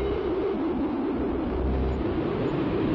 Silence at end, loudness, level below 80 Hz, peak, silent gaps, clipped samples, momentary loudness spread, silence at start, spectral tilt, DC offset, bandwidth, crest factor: 0 s; -27 LUFS; -36 dBFS; -16 dBFS; none; under 0.1%; 1 LU; 0 s; -10 dB/octave; under 0.1%; 5.8 kHz; 10 dB